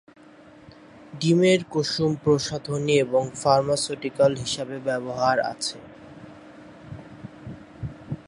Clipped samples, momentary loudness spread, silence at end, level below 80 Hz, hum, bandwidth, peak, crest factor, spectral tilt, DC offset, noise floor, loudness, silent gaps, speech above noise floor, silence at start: under 0.1%; 22 LU; 0.05 s; -56 dBFS; none; 11.5 kHz; -4 dBFS; 20 dB; -5 dB/octave; under 0.1%; -49 dBFS; -23 LUFS; none; 26 dB; 0.95 s